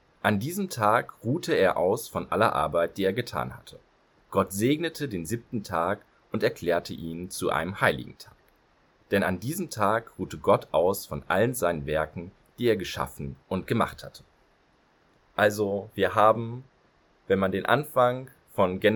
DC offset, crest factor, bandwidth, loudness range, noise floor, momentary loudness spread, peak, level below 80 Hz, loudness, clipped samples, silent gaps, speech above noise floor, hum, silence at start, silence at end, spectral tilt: under 0.1%; 24 dB; 19 kHz; 4 LU; -64 dBFS; 12 LU; -4 dBFS; -56 dBFS; -27 LUFS; under 0.1%; none; 38 dB; none; 0.25 s; 0 s; -5.5 dB/octave